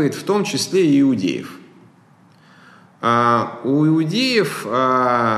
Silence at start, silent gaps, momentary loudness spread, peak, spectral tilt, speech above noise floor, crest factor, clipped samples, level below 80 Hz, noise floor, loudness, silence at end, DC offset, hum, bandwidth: 0 s; none; 7 LU; -4 dBFS; -5.5 dB/octave; 34 dB; 14 dB; under 0.1%; -66 dBFS; -51 dBFS; -17 LUFS; 0 s; under 0.1%; none; 13 kHz